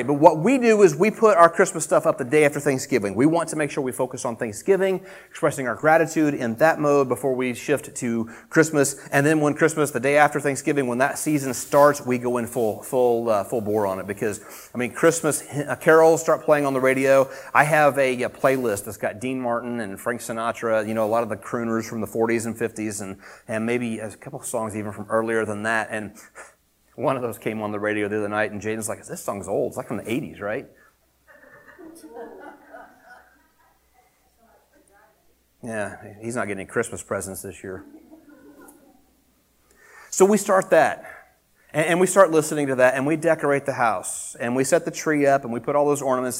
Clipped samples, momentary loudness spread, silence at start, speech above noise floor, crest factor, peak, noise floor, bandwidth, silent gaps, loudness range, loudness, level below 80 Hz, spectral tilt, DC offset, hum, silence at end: under 0.1%; 13 LU; 0 s; 41 dB; 22 dB; 0 dBFS; -62 dBFS; 16.5 kHz; none; 12 LU; -22 LUFS; -64 dBFS; -5 dB/octave; under 0.1%; none; 0 s